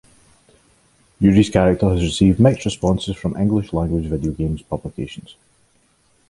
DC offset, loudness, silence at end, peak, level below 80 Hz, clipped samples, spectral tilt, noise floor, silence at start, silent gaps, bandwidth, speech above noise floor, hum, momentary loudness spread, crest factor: under 0.1%; -18 LUFS; 1 s; 0 dBFS; -34 dBFS; under 0.1%; -7 dB/octave; -60 dBFS; 1.2 s; none; 11.5 kHz; 42 dB; none; 14 LU; 18 dB